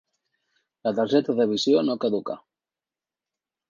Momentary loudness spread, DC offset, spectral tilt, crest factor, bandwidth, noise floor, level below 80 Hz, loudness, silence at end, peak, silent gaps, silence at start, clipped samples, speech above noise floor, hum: 11 LU; under 0.1%; -5.5 dB/octave; 20 dB; 7.2 kHz; under -90 dBFS; -74 dBFS; -23 LUFS; 1.3 s; -8 dBFS; none; 0.85 s; under 0.1%; over 67 dB; none